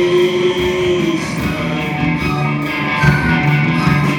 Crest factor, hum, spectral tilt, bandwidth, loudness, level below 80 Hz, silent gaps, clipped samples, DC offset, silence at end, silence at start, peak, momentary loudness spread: 14 dB; none; -6.5 dB/octave; 18 kHz; -15 LUFS; -34 dBFS; none; under 0.1%; under 0.1%; 0 s; 0 s; 0 dBFS; 5 LU